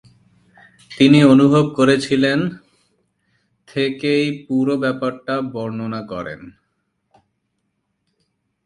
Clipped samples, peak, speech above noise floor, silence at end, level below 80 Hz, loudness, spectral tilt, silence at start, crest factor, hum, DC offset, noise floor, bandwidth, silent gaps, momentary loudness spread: under 0.1%; 0 dBFS; 55 dB; 2.15 s; -58 dBFS; -17 LUFS; -6.5 dB/octave; 0.9 s; 18 dB; none; under 0.1%; -72 dBFS; 11 kHz; none; 18 LU